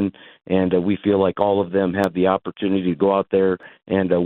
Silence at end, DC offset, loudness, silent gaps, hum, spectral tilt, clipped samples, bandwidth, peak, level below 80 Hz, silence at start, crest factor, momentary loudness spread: 0 s; under 0.1%; -20 LUFS; none; none; -8.5 dB/octave; under 0.1%; 8 kHz; -4 dBFS; -56 dBFS; 0 s; 16 dB; 5 LU